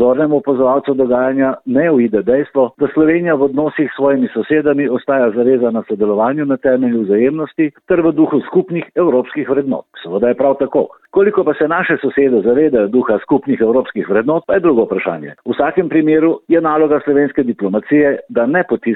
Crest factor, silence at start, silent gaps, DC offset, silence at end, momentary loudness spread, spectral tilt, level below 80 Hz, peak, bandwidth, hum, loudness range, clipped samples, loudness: 12 dB; 0 s; none; under 0.1%; 0 s; 5 LU; -11 dB/octave; -52 dBFS; -2 dBFS; 4.1 kHz; none; 2 LU; under 0.1%; -14 LUFS